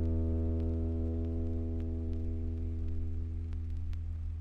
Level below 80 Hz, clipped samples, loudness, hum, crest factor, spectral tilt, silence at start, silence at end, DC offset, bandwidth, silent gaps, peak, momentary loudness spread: -38 dBFS; under 0.1%; -37 LUFS; none; 12 dB; -11 dB/octave; 0 s; 0 s; under 0.1%; 3 kHz; none; -22 dBFS; 6 LU